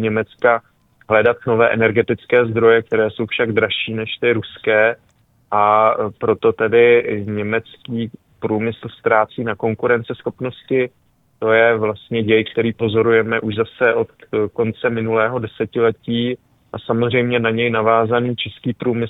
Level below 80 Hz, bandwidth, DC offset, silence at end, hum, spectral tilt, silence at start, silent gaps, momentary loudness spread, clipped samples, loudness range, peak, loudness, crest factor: -56 dBFS; 4 kHz; under 0.1%; 0 s; none; -9 dB/octave; 0 s; none; 10 LU; under 0.1%; 4 LU; 0 dBFS; -17 LUFS; 16 dB